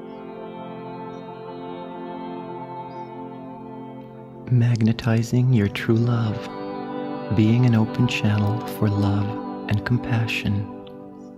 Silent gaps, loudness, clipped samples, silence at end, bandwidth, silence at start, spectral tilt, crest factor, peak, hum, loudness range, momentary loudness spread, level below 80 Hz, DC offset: none; -22 LUFS; under 0.1%; 0 s; 14 kHz; 0 s; -7.5 dB/octave; 16 dB; -6 dBFS; none; 13 LU; 17 LU; -52 dBFS; under 0.1%